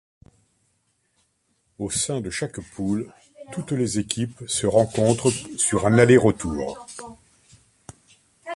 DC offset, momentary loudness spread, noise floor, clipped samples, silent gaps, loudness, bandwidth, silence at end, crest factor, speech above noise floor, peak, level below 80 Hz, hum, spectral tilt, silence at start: under 0.1%; 20 LU; -69 dBFS; under 0.1%; none; -22 LUFS; 11.5 kHz; 0 s; 22 dB; 48 dB; -2 dBFS; -50 dBFS; none; -5 dB/octave; 1.8 s